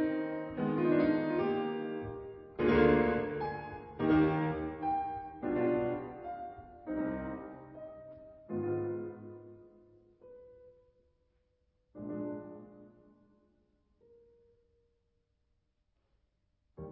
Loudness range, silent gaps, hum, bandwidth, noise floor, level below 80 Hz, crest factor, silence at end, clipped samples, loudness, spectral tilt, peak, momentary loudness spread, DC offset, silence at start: 17 LU; none; none; 5.6 kHz; -78 dBFS; -56 dBFS; 22 dB; 0 s; under 0.1%; -33 LUFS; -6.5 dB/octave; -14 dBFS; 21 LU; under 0.1%; 0 s